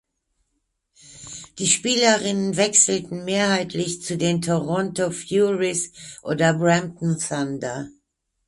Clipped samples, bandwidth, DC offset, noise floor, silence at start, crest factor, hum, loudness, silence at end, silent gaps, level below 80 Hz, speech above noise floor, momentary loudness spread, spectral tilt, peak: under 0.1%; 11.5 kHz; under 0.1%; -74 dBFS; 1.1 s; 20 dB; none; -21 LUFS; 0.55 s; none; -60 dBFS; 53 dB; 15 LU; -3.5 dB/octave; -2 dBFS